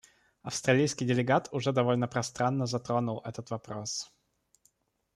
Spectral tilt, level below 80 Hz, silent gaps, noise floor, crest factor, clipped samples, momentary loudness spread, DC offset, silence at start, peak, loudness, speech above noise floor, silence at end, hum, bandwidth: -5 dB/octave; -68 dBFS; none; -71 dBFS; 20 dB; under 0.1%; 12 LU; under 0.1%; 0.45 s; -12 dBFS; -30 LUFS; 41 dB; 1.1 s; none; 12.5 kHz